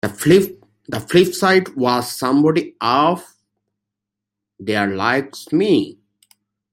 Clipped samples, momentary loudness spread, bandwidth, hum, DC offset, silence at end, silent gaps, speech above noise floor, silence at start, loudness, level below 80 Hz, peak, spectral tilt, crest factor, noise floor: under 0.1%; 13 LU; 16.5 kHz; none; under 0.1%; 0.8 s; none; 67 dB; 0.05 s; -17 LUFS; -56 dBFS; -2 dBFS; -5 dB/octave; 18 dB; -83 dBFS